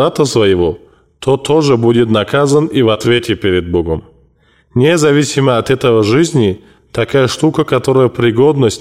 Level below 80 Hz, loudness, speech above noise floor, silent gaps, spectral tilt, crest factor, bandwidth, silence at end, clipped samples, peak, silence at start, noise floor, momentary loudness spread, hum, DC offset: -40 dBFS; -12 LUFS; 40 dB; none; -6 dB/octave; 10 dB; 15 kHz; 0 s; under 0.1%; -2 dBFS; 0 s; -51 dBFS; 7 LU; none; 0.2%